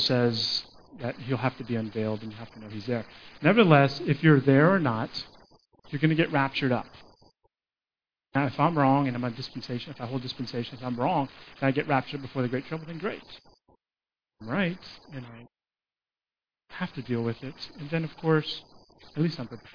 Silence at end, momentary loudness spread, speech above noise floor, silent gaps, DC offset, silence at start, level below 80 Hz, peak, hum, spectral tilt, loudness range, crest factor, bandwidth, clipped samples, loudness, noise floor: 0.05 s; 19 LU; over 63 dB; none; under 0.1%; 0 s; -62 dBFS; -4 dBFS; none; -7.5 dB/octave; 13 LU; 24 dB; 5.4 kHz; under 0.1%; -27 LUFS; under -90 dBFS